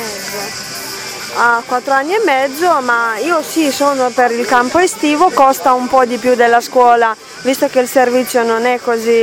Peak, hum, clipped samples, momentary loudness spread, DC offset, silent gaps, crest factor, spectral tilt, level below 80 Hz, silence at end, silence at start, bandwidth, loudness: 0 dBFS; none; under 0.1%; 11 LU; under 0.1%; none; 12 dB; -2.5 dB/octave; -54 dBFS; 0 s; 0 s; 17.5 kHz; -13 LUFS